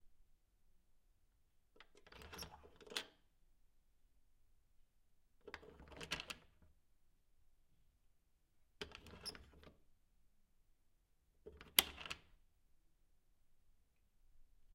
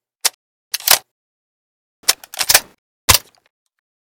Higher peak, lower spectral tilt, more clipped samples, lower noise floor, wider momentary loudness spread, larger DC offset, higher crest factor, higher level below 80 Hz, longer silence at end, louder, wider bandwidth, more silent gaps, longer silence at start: second, -8 dBFS vs 0 dBFS; about the same, -0.5 dB/octave vs 0.5 dB/octave; second, under 0.1% vs 0.3%; second, -76 dBFS vs under -90 dBFS; first, 27 LU vs 8 LU; neither; first, 44 dB vs 20 dB; second, -70 dBFS vs -40 dBFS; second, 0 s vs 0.95 s; second, -43 LUFS vs -15 LUFS; second, 16 kHz vs over 20 kHz; second, none vs 0.34-0.71 s, 1.11-2.03 s, 2.78-3.08 s; second, 0.05 s vs 0.25 s